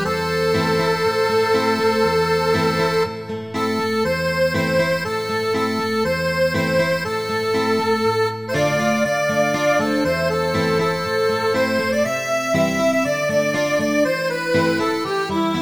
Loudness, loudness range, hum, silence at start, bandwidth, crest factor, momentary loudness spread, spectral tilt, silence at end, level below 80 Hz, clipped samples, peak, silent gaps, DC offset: -19 LUFS; 1 LU; none; 0 s; over 20 kHz; 14 dB; 4 LU; -5 dB/octave; 0 s; -48 dBFS; under 0.1%; -6 dBFS; none; 0.2%